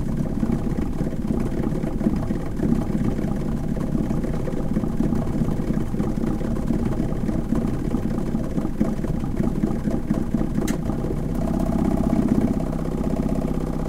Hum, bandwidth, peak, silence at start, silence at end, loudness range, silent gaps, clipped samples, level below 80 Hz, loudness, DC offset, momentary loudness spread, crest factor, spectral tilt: none; 15.5 kHz; -6 dBFS; 0 s; 0 s; 2 LU; none; under 0.1%; -30 dBFS; -24 LUFS; under 0.1%; 4 LU; 16 dB; -8.5 dB/octave